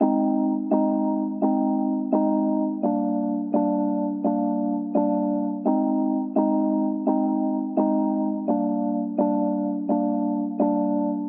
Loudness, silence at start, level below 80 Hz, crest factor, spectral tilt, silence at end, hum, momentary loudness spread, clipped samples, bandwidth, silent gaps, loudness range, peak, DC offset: -24 LUFS; 0 s; -84 dBFS; 14 dB; -14.5 dB/octave; 0 s; none; 3 LU; under 0.1%; 2.7 kHz; none; 1 LU; -8 dBFS; under 0.1%